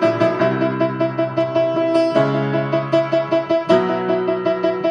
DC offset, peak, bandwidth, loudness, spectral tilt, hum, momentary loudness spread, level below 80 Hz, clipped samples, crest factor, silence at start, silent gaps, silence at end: under 0.1%; -2 dBFS; 9.4 kHz; -18 LUFS; -7.5 dB/octave; none; 3 LU; -60 dBFS; under 0.1%; 16 dB; 0 s; none; 0 s